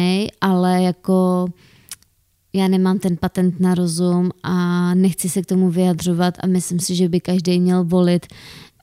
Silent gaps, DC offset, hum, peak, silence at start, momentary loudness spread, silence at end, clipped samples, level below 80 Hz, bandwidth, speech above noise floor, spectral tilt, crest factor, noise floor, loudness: none; under 0.1%; none; -4 dBFS; 0 s; 6 LU; 0.2 s; under 0.1%; -52 dBFS; 15 kHz; 42 dB; -6.5 dB/octave; 14 dB; -60 dBFS; -18 LUFS